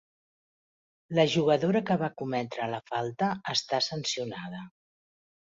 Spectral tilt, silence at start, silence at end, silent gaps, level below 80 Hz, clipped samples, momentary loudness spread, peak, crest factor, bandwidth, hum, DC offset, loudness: -5 dB/octave; 1.1 s; 0.75 s; none; -70 dBFS; under 0.1%; 10 LU; -10 dBFS; 20 dB; 8 kHz; none; under 0.1%; -29 LUFS